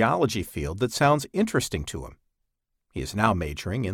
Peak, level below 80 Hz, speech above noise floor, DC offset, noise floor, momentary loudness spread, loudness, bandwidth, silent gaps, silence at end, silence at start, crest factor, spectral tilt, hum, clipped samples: -4 dBFS; -44 dBFS; 53 dB; under 0.1%; -78 dBFS; 14 LU; -26 LUFS; 18 kHz; none; 0 s; 0 s; 22 dB; -5 dB/octave; none; under 0.1%